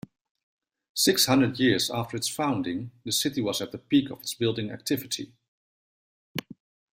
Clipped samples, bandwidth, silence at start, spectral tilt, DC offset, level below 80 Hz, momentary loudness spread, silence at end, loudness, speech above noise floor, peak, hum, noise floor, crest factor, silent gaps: under 0.1%; 16 kHz; 0.95 s; -3.5 dB/octave; under 0.1%; -64 dBFS; 14 LU; 0.6 s; -26 LUFS; over 64 dB; -8 dBFS; none; under -90 dBFS; 20 dB; 5.48-6.35 s